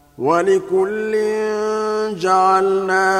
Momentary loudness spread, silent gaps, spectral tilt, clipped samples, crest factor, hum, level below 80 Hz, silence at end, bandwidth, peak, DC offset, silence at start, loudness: 6 LU; none; -5 dB/octave; under 0.1%; 14 dB; none; -58 dBFS; 0 s; 13 kHz; -2 dBFS; under 0.1%; 0.2 s; -17 LUFS